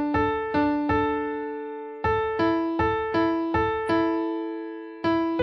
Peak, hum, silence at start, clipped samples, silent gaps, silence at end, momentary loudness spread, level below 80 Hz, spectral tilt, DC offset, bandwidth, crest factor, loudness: -12 dBFS; none; 0 s; under 0.1%; none; 0 s; 9 LU; -48 dBFS; -8 dB/octave; under 0.1%; 10.5 kHz; 14 dB; -25 LUFS